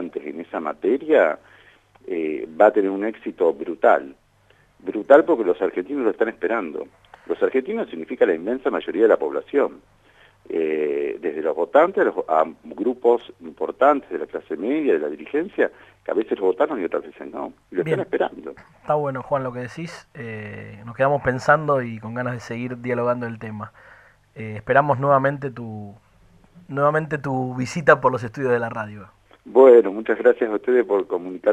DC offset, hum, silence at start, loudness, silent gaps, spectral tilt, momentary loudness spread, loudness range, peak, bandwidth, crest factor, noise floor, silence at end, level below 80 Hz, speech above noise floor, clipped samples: under 0.1%; none; 0 s; -21 LUFS; none; -7.5 dB/octave; 16 LU; 7 LU; 0 dBFS; 9.4 kHz; 22 dB; -57 dBFS; 0 s; -60 dBFS; 37 dB; under 0.1%